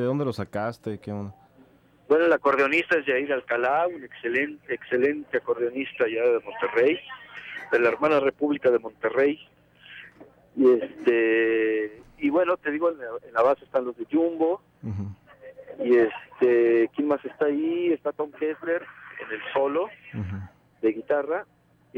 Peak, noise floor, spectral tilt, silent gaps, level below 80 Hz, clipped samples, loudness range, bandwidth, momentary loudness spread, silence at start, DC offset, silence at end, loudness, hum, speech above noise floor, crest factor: -10 dBFS; -56 dBFS; -7.5 dB/octave; none; -66 dBFS; under 0.1%; 4 LU; 7.8 kHz; 14 LU; 0 s; under 0.1%; 0 s; -25 LUFS; none; 32 dB; 14 dB